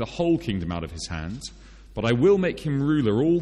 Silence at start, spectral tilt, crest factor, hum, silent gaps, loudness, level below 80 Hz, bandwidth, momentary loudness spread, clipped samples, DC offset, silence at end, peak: 0 s; -7 dB/octave; 14 dB; none; none; -24 LUFS; -44 dBFS; 11.5 kHz; 15 LU; under 0.1%; under 0.1%; 0 s; -8 dBFS